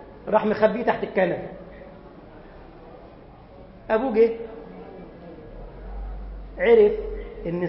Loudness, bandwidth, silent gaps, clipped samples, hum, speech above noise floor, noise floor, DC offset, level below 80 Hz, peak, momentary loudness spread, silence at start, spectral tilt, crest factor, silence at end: -22 LUFS; 5.8 kHz; none; under 0.1%; none; 25 dB; -46 dBFS; under 0.1%; -42 dBFS; -4 dBFS; 26 LU; 0 s; -10.5 dB/octave; 20 dB; 0 s